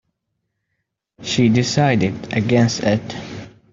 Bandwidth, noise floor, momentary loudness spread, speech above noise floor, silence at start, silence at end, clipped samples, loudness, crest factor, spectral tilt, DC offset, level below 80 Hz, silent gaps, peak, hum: 7.8 kHz; -75 dBFS; 16 LU; 58 dB; 1.2 s; 0.25 s; under 0.1%; -18 LUFS; 16 dB; -5.5 dB/octave; under 0.1%; -52 dBFS; none; -2 dBFS; none